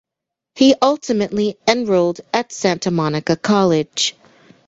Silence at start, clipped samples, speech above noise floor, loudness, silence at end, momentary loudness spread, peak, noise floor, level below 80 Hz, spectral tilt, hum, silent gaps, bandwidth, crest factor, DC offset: 0.55 s; under 0.1%; 67 dB; -17 LUFS; 0.55 s; 6 LU; -2 dBFS; -83 dBFS; -56 dBFS; -4.5 dB/octave; none; none; 8.2 kHz; 16 dB; under 0.1%